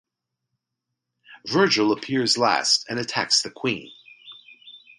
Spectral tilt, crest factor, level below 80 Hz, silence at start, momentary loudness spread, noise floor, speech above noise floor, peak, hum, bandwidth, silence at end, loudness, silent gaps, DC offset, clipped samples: -2.5 dB/octave; 22 dB; -68 dBFS; 1.3 s; 9 LU; -83 dBFS; 61 dB; -4 dBFS; none; 11.5 kHz; 0.2 s; -21 LUFS; none; under 0.1%; under 0.1%